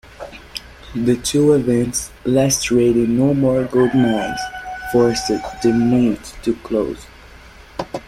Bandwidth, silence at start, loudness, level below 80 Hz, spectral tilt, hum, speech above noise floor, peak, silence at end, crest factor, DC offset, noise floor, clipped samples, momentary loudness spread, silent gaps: 15.5 kHz; 0.2 s; -17 LUFS; -42 dBFS; -5 dB/octave; none; 25 dB; -2 dBFS; 0.05 s; 16 dB; under 0.1%; -41 dBFS; under 0.1%; 16 LU; none